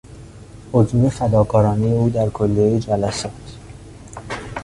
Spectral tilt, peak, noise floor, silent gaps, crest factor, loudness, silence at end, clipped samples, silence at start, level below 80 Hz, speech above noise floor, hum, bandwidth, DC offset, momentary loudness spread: -7.5 dB/octave; -2 dBFS; -39 dBFS; none; 18 dB; -18 LUFS; 0 s; under 0.1%; 0.05 s; -40 dBFS; 22 dB; none; 11.5 kHz; under 0.1%; 22 LU